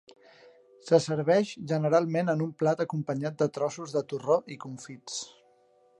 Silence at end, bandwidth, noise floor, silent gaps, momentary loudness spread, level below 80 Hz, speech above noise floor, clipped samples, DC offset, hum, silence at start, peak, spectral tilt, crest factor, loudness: 0.7 s; 11 kHz; -63 dBFS; none; 16 LU; -76 dBFS; 36 dB; under 0.1%; under 0.1%; none; 0.85 s; -8 dBFS; -6 dB/octave; 22 dB; -28 LUFS